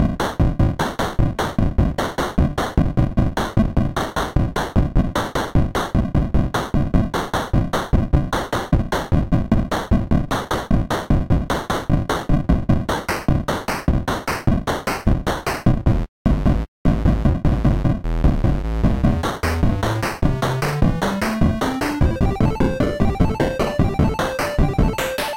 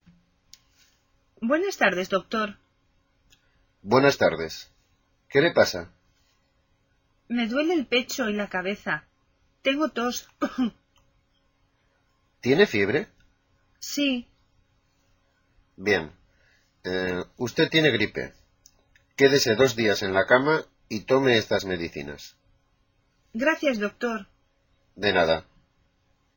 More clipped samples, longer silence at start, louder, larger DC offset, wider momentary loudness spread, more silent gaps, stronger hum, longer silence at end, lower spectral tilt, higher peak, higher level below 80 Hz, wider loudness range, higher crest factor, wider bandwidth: neither; second, 0 s vs 1.4 s; first, -20 LUFS vs -24 LUFS; neither; second, 3 LU vs 15 LU; first, 16.08-16.25 s, 16.68-16.85 s vs none; neither; second, 0 s vs 0.95 s; first, -6.5 dB/octave vs -4.5 dB/octave; about the same, -6 dBFS vs -4 dBFS; first, -24 dBFS vs -60 dBFS; second, 1 LU vs 8 LU; second, 12 dB vs 22 dB; about the same, 16.5 kHz vs 17 kHz